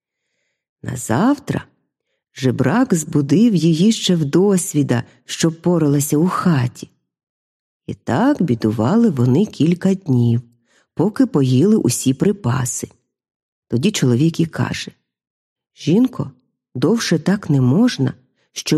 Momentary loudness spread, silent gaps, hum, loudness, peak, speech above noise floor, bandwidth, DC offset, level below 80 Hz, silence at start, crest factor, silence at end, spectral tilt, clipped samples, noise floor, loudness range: 12 LU; 7.23-7.80 s, 13.36-13.62 s, 15.30-15.56 s; none; -17 LUFS; -2 dBFS; 58 dB; 14.5 kHz; under 0.1%; -54 dBFS; 0.85 s; 16 dB; 0 s; -6 dB/octave; under 0.1%; -74 dBFS; 4 LU